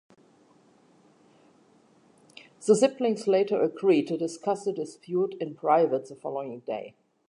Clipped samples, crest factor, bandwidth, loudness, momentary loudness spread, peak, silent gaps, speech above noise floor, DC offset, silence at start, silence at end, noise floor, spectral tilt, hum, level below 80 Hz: under 0.1%; 20 dB; 11.5 kHz; -27 LUFS; 13 LU; -8 dBFS; none; 35 dB; under 0.1%; 2.6 s; 0.4 s; -61 dBFS; -5.5 dB/octave; none; -84 dBFS